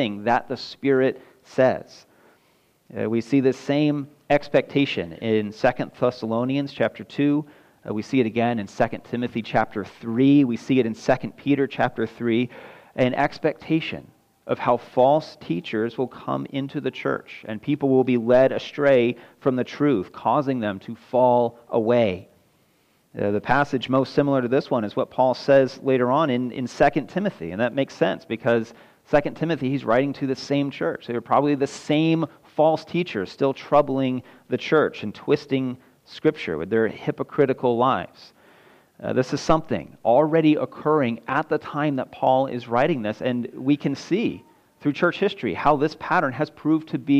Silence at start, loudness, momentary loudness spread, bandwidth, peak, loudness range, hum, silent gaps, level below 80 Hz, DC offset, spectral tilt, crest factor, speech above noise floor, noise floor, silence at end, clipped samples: 0 s; -23 LUFS; 10 LU; 9 kHz; -6 dBFS; 3 LU; none; none; -56 dBFS; under 0.1%; -7 dB/octave; 16 dB; 41 dB; -63 dBFS; 0 s; under 0.1%